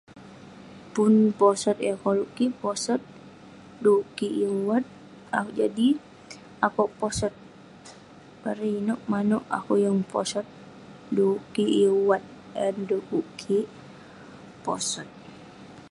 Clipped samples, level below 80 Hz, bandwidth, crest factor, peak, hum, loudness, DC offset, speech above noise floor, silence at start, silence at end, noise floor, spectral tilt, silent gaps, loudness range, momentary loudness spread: under 0.1%; -60 dBFS; 11.5 kHz; 20 dB; -6 dBFS; none; -26 LUFS; under 0.1%; 24 dB; 0.15 s; 0.05 s; -49 dBFS; -5 dB/octave; none; 4 LU; 25 LU